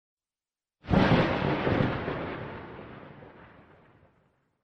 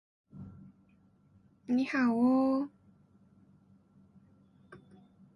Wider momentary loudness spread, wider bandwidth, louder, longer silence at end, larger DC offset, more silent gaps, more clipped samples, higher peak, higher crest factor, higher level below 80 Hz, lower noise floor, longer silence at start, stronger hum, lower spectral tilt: about the same, 24 LU vs 24 LU; about the same, 7 kHz vs 6.6 kHz; first, -27 LUFS vs -30 LUFS; first, 1.2 s vs 0.6 s; neither; neither; neither; first, -12 dBFS vs -18 dBFS; about the same, 18 dB vs 16 dB; first, -46 dBFS vs -72 dBFS; first, under -90 dBFS vs -65 dBFS; first, 0.85 s vs 0.35 s; neither; about the same, -8 dB/octave vs -7 dB/octave